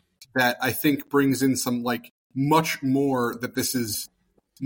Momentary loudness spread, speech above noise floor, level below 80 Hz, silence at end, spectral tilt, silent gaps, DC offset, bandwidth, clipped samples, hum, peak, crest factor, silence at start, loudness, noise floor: 8 LU; 25 dB; -62 dBFS; 0 s; -4.5 dB/octave; 2.11-2.30 s; under 0.1%; 17 kHz; under 0.1%; none; -8 dBFS; 18 dB; 0.2 s; -24 LUFS; -48 dBFS